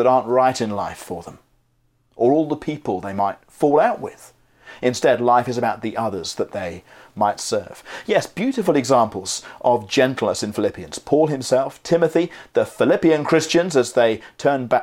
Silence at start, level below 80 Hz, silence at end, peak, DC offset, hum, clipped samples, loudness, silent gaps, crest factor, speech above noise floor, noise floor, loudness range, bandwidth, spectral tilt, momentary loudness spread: 0 s; -58 dBFS; 0 s; -2 dBFS; under 0.1%; none; under 0.1%; -20 LUFS; none; 18 dB; 44 dB; -64 dBFS; 4 LU; 16.5 kHz; -5 dB/octave; 11 LU